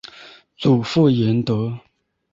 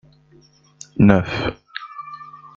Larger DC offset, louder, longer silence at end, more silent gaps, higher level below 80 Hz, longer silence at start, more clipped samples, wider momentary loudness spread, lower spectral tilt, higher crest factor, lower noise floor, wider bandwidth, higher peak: neither; about the same, -19 LUFS vs -17 LUFS; first, 0.55 s vs 0.2 s; neither; second, -54 dBFS vs -44 dBFS; second, 0.15 s vs 0.95 s; neither; second, 16 LU vs 21 LU; about the same, -8 dB/octave vs -7 dB/octave; about the same, 16 dB vs 20 dB; second, -45 dBFS vs -53 dBFS; about the same, 7.8 kHz vs 7.6 kHz; about the same, -4 dBFS vs -2 dBFS